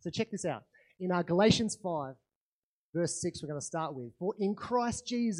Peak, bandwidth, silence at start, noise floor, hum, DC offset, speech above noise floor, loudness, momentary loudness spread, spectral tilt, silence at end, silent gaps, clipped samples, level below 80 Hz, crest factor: -12 dBFS; 11.5 kHz; 0.05 s; under -90 dBFS; none; under 0.1%; over 58 dB; -33 LUFS; 12 LU; -5 dB/octave; 0 s; 2.35-2.93 s; under 0.1%; -64 dBFS; 22 dB